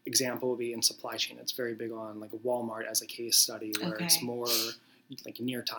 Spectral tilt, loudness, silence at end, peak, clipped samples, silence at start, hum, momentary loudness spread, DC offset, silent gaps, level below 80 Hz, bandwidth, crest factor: -1.5 dB/octave; -30 LUFS; 0 s; -8 dBFS; under 0.1%; 0.05 s; none; 15 LU; under 0.1%; none; -90 dBFS; over 20 kHz; 24 dB